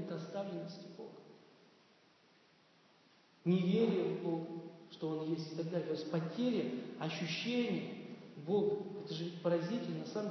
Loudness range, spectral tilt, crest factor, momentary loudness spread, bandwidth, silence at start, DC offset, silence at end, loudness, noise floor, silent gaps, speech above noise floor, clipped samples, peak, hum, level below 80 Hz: 5 LU; -6 dB/octave; 18 dB; 15 LU; 6.2 kHz; 0 s; under 0.1%; 0 s; -38 LUFS; -68 dBFS; none; 31 dB; under 0.1%; -22 dBFS; none; under -90 dBFS